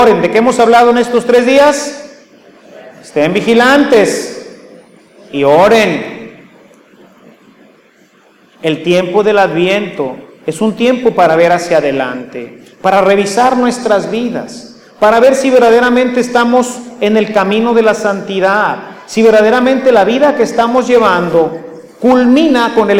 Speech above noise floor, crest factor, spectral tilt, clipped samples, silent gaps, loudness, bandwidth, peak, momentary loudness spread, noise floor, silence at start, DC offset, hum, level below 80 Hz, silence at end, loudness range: 37 dB; 10 dB; -5 dB/octave; under 0.1%; none; -10 LUFS; 16 kHz; 0 dBFS; 14 LU; -46 dBFS; 0 s; under 0.1%; none; -48 dBFS; 0 s; 5 LU